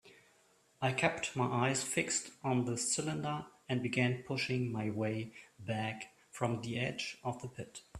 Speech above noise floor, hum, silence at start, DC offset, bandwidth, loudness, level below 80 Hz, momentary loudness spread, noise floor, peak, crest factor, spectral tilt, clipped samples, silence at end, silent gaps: 33 dB; none; 0.05 s; under 0.1%; 13.5 kHz; -36 LUFS; -70 dBFS; 11 LU; -69 dBFS; -14 dBFS; 24 dB; -4 dB/octave; under 0.1%; 0 s; none